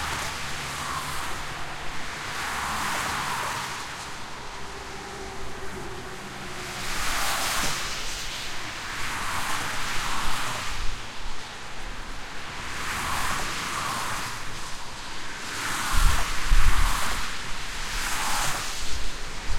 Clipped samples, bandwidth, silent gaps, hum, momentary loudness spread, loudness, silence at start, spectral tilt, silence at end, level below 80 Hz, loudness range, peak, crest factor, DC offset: under 0.1%; 16.5 kHz; none; none; 11 LU; -30 LUFS; 0 s; -2 dB/octave; 0 s; -32 dBFS; 5 LU; -4 dBFS; 20 dB; under 0.1%